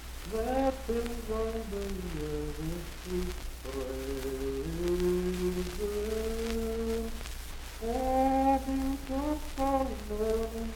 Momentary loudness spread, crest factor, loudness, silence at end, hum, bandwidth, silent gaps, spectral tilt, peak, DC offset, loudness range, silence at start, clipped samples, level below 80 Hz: 10 LU; 18 dB; -33 LUFS; 0 s; none; 18.5 kHz; none; -5.5 dB/octave; -14 dBFS; under 0.1%; 5 LU; 0 s; under 0.1%; -40 dBFS